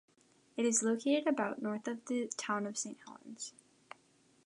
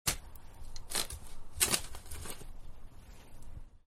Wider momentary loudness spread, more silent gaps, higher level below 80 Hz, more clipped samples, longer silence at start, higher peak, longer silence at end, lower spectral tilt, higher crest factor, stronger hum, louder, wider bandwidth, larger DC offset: second, 22 LU vs 26 LU; neither; second, -88 dBFS vs -46 dBFS; neither; first, 0.55 s vs 0.05 s; second, -18 dBFS vs -10 dBFS; first, 0.95 s vs 0.1 s; first, -3 dB/octave vs -1 dB/octave; second, 18 dB vs 28 dB; neither; about the same, -35 LUFS vs -35 LUFS; second, 11 kHz vs 16 kHz; neither